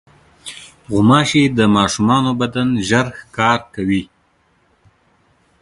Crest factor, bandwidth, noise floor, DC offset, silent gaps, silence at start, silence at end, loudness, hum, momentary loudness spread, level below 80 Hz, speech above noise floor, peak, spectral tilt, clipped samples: 16 dB; 11.5 kHz; -59 dBFS; under 0.1%; none; 0.45 s; 1.55 s; -15 LUFS; none; 20 LU; -46 dBFS; 44 dB; 0 dBFS; -5 dB/octave; under 0.1%